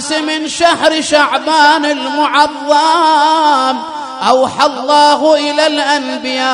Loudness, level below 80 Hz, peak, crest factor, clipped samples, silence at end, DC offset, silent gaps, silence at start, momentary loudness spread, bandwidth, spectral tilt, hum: -11 LUFS; -54 dBFS; 0 dBFS; 12 dB; 0.2%; 0 s; under 0.1%; none; 0 s; 6 LU; 10.5 kHz; -1.5 dB/octave; none